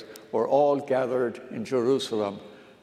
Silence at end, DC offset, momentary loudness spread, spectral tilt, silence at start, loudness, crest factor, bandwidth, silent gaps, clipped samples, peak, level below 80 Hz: 0.2 s; under 0.1%; 10 LU; -5.5 dB/octave; 0 s; -26 LUFS; 16 dB; 14.5 kHz; none; under 0.1%; -10 dBFS; -78 dBFS